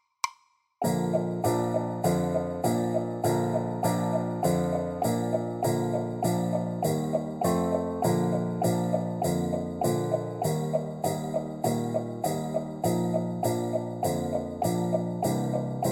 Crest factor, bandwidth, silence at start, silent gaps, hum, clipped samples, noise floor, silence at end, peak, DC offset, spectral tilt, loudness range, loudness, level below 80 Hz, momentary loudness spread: 16 dB; 17 kHz; 0.25 s; none; none; under 0.1%; -62 dBFS; 0 s; -12 dBFS; under 0.1%; -6.5 dB/octave; 2 LU; -28 LUFS; -58 dBFS; 4 LU